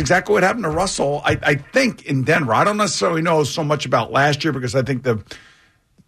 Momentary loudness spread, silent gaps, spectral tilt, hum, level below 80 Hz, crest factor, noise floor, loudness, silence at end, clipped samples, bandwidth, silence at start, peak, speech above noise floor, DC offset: 5 LU; none; -4.5 dB/octave; none; -46 dBFS; 12 dB; -55 dBFS; -18 LUFS; 0.7 s; under 0.1%; 13.5 kHz; 0 s; -6 dBFS; 37 dB; under 0.1%